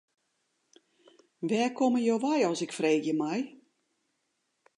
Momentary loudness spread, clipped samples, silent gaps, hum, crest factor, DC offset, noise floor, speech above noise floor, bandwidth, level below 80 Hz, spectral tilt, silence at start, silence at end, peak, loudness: 8 LU; under 0.1%; none; none; 18 dB; under 0.1%; -79 dBFS; 51 dB; 11 kHz; -86 dBFS; -5 dB/octave; 1.4 s; 1.3 s; -14 dBFS; -29 LUFS